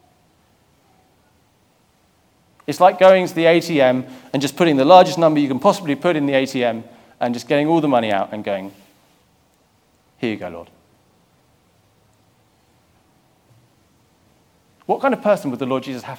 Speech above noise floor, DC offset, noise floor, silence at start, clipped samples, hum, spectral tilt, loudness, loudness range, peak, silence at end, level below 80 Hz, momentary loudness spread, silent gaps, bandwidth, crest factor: 43 dB; under 0.1%; -59 dBFS; 2.7 s; under 0.1%; none; -5.5 dB/octave; -17 LUFS; 19 LU; 0 dBFS; 0 s; -68 dBFS; 16 LU; none; 17.5 kHz; 20 dB